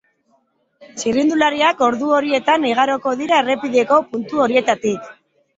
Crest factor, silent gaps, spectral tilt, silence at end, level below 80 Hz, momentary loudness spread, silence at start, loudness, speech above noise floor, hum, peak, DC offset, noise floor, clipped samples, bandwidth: 16 dB; none; -3.5 dB/octave; 0.45 s; -60 dBFS; 7 LU; 0.8 s; -17 LUFS; 46 dB; none; -2 dBFS; under 0.1%; -62 dBFS; under 0.1%; 8 kHz